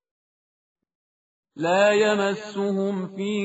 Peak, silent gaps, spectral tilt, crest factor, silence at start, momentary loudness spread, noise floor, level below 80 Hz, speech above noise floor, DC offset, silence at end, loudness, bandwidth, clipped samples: -6 dBFS; none; -4 dB/octave; 18 dB; 1.55 s; 10 LU; under -90 dBFS; -72 dBFS; over 68 dB; under 0.1%; 0 s; -23 LUFS; 8 kHz; under 0.1%